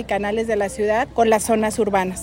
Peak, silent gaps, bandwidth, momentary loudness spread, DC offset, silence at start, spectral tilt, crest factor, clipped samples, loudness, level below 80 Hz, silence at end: -4 dBFS; none; 16.5 kHz; 4 LU; under 0.1%; 0 s; -4.5 dB/octave; 16 dB; under 0.1%; -20 LUFS; -44 dBFS; 0 s